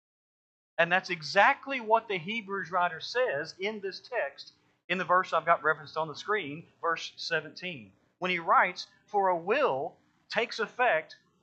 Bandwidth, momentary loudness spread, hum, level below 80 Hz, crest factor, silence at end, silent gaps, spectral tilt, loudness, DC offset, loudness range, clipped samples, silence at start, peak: 8.4 kHz; 14 LU; none; -86 dBFS; 22 dB; 0.3 s; 4.84-4.89 s; -4 dB/octave; -29 LUFS; under 0.1%; 3 LU; under 0.1%; 0.8 s; -8 dBFS